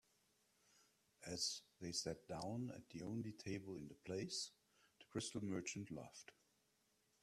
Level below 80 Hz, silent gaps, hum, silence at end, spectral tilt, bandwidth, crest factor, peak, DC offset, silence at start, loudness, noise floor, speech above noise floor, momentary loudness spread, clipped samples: -78 dBFS; none; none; 0.9 s; -3.5 dB/octave; 14 kHz; 20 dB; -30 dBFS; under 0.1%; 0.8 s; -48 LUFS; -82 dBFS; 33 dB; 10 LU; under 0.1%